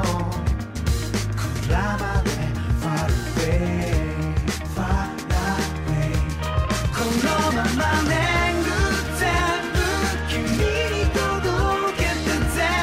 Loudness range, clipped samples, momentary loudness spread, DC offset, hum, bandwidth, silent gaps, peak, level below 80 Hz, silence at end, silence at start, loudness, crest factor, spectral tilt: 3 LU; under 0.1%; 5 LU; under 0.1%; none; 16 kHz; none; -8 dBFS; -28 dBFS; 0 s; 0 s; -23 LUFS; 14 dB; -5 dB/octave